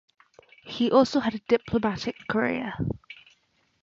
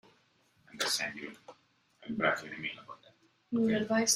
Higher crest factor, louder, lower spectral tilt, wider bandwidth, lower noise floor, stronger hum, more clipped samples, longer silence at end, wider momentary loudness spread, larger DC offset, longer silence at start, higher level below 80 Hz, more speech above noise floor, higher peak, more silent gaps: about the same, 20 dB vs 22 dB; first, -26 LUFS vs -33 LUFS; first, -6 dB/octave vs -2.5 dB/octave; second, 7.6 kHz vs 15 kHz; about the same, -67 dBFS vs -70 dBFS; neither; neither; first, 0.7 s vs 0 s; second, 18 LU vs 23 LU; neither; about the same, 0.65 s vs 0.75 s; first, -52 dBFS vs -72 dBFS; first, 42 dB vs 37 dB; first, -6 dBFS vs -12 dBFS; neither